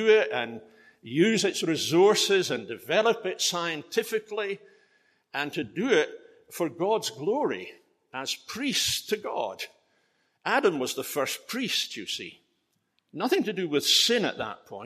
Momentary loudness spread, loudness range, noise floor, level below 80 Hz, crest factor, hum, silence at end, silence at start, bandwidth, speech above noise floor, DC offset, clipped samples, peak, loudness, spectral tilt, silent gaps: 15 LU; 5 LU; -75 dBFS; -72 dBFS; 18 dB; none; 0 s; 0 s; 15 kHz; 48 dB; under 0.1%; under 0.1%; -10 dBFS; -27 LUFS; -3 dB/octave; none